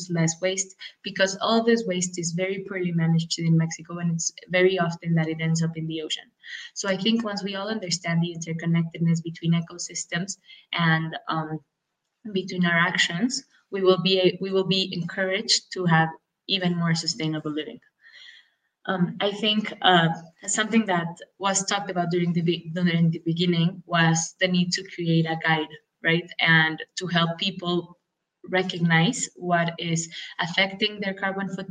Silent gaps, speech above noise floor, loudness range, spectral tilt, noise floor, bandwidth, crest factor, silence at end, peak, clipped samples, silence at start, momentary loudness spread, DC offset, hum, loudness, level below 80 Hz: none; 56 dB; 4 LU; -4.5 dB/octave; -80 dBFS; 9.6 kHz; 22 dB; 0.05 s; -2 dBFS; under 0.1%; 0 s; 10 LU; under 0.1%; none; -24 LUFS; -72 dBFS